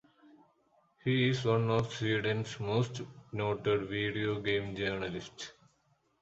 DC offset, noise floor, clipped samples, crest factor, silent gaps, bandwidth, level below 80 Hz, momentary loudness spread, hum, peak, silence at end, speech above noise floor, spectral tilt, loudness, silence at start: under 0.1%; -73 dBFS; under 0.1%; 18 dB; none; 8 kHz; -62 dBFS; 13 LU; none; -16 dBFS; 0.7 s; 41 dB; -6 dB/octave; -33 LUFS; 1.05 s